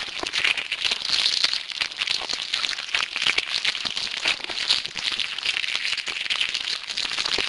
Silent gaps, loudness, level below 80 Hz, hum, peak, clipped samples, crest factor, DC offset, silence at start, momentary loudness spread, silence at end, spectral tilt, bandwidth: none; -23 LUFS; -58 dBFS; none; -2 dBFS; under 0.1%; 24 dB; under 0.1%; 0 s; 5 LU; 0 s; 1 dB/octave; 11.5 kHz